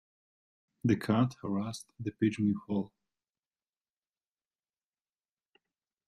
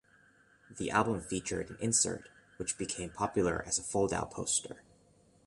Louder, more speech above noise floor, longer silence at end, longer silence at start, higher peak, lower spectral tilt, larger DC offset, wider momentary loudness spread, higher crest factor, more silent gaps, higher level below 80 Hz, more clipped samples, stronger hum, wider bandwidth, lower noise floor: about the same, -32 LUFS vs -33 LUFS; first, over 59 dB vs 31 dB; first, 3.2 s vs 0.65 s; first, 0.85 s vs 0.7 s; second, -16 dBFS vs -12 dBFS; first, -7 dB/octave vs -3.5 dB/octave; neither; about the same, 12 LU vs 11 LU; about the same, 20 dB vs 22 dB; neither; second, -68 dBFS vs -58 dBFS; neither; neither; first, 13 kHz vs 11.5 kHz; first, under -90 dBFS vs -65 dBFS